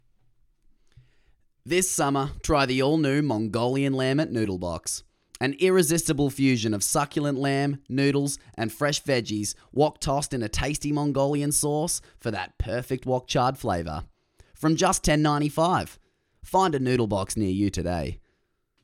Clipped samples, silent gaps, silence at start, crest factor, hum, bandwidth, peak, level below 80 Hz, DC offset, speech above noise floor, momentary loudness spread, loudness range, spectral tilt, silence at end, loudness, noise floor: under 0.1%; none; 1.65 s; 18 dB; none; 16.5 kHz; -6 dBFS; -44 dBFS; under 0.1%; 47 dB; 8 LU; 2 LU; -4.5 dB/octave; 0.65 s; -25 LUFS; -72 dBFS